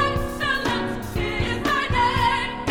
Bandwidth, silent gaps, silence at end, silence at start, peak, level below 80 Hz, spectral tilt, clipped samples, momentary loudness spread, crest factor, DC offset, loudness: over 20 kHz; none; 0 s; 0 s; -8 dBFS; -34 dBFS; -5 dB/octave; under 0.1%; 7 LU; 14 dB; under 0.1%; -23 LUFS